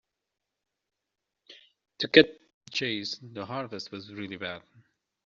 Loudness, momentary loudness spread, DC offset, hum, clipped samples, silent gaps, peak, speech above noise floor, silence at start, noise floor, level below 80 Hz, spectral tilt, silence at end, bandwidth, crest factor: -27 LUFS; 19 LU; under 0.1%; none; under 0.1%; 2.54-2.61 s; -2 dBFS; 58 dB; 1.5 s; -86 dBFS; -70 dBFS; -2 dB/octave; 0.65 s; 7.4 kHz; 28 dB